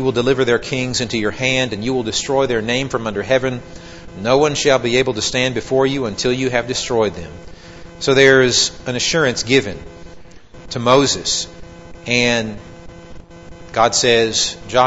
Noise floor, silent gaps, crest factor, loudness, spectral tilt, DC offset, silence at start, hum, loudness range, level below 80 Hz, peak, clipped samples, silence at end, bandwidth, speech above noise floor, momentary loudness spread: -39 dBFS; none; 18 dB; -16 LUFS; -3.5 dB/octave; 0.6%; 0 s; none; 3 LU; -42 dBFS; 0 dBFS; under 0.1%; 0 s; 8 kHz; 22 dB; 14 LU